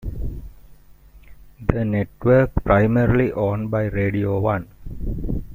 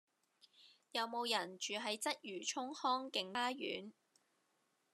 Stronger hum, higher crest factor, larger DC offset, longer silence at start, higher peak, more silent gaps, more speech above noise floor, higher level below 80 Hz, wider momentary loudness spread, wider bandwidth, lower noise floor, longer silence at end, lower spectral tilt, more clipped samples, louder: neither; second, 18 dB vs 24 dB; neither; second, 0 s vs 0.6 s; first, -2 dBFS vs -20 dBFS; neither; second, 28 dB vs 40 dB; first, -32 dBFS vs under -90 dBFS; first, 15 LU vs 6 LU; first, 16 kHz vs 13.5 kHz; second, -47 dBFS vs -81 dBFS; second, 0 s vs 1 s; first, -10 dB/octave vs -1.5 dB/octave; neither; first, -21 LUFS vs -41 LUFS